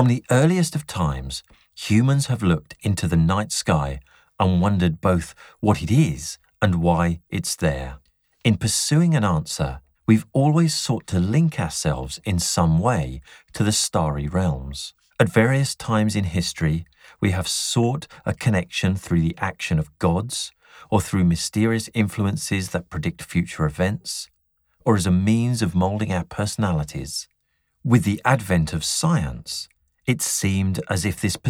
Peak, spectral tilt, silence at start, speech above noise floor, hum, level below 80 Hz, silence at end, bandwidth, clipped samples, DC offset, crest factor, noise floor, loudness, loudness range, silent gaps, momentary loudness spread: -4 dBFS; -5.5 dB/octave; 0 s; 50 dB; none; -40 dBFS; 0 s; 16 kHz; under 0.1%; under 0.1%; 18 dB; -71 dBFS; -22 LUFS; 2 LU; none; 11 LU